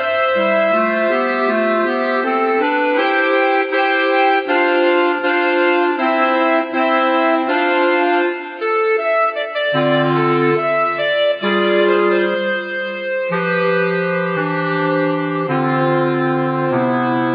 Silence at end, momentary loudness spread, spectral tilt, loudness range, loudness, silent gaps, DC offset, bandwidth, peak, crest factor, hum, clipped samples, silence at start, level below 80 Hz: 0 s; 4 LU; -8.5 dB/octave; 3 LU; -16 LUFS; none; under 0.1%; 5.2 kHz; -4 dBFS; 12 dB; none; under 0.1%; 0 s; -74 dBFS